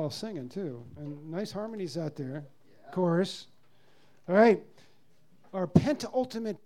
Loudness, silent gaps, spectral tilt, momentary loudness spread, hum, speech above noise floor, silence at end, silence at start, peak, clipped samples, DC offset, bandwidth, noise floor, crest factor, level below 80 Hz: -30 LUFS; none; -7 dB/octave; 19 LU; none; 37 dB; 0.1 s; 0 s; -6 dBFS; under 0.1%; 0.2%; 13.5 kHz; -66 dBFS; 24 dB; -60 dBFS